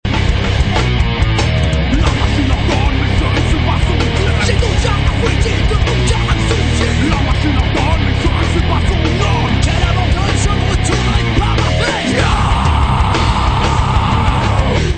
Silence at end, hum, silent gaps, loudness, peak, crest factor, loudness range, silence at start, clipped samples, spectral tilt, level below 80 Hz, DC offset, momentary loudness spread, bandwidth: 0 s; none; none; -14 LUFS; 0 dBFS; 12 dB; 1 LU; 0.05 s; under 0.1%; -5.5 dB/octave; -16 dBFS; 0.2%; 1 LU; 9.2 kHz